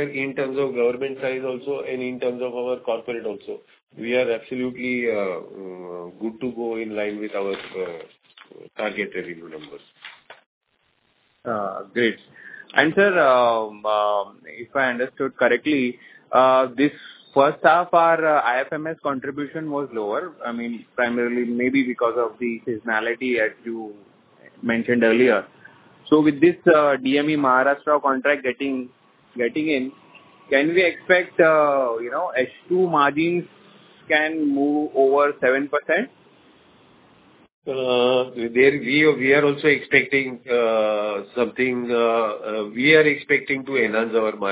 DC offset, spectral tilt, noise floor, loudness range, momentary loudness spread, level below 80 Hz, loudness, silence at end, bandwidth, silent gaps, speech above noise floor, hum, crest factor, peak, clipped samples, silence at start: under 0.1%; -9 dB/octave; -66 dBFS; 10 LU; 14 LU; -66 dBFS; -21 LUFS; 0 s; 4 kHz; 3.83-3.87 s, 10.46-10.61 s, 37.52-37.62 s; 46 dB; none; 20 dB; 0 dBFS; under 0.1%; 0 s